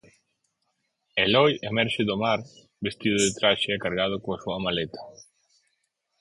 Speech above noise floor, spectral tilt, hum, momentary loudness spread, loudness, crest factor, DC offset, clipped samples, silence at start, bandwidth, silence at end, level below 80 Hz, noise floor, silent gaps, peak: 51 dB; -3.5 dB/octave; none; 11 LU; -25 LUFS; 22 dB; under 0.1%; under 0.1%; 1.15 s; 11.5 kHz; 1.1 s; -58 dBFS; -76 dBFS; none; -6 dBFS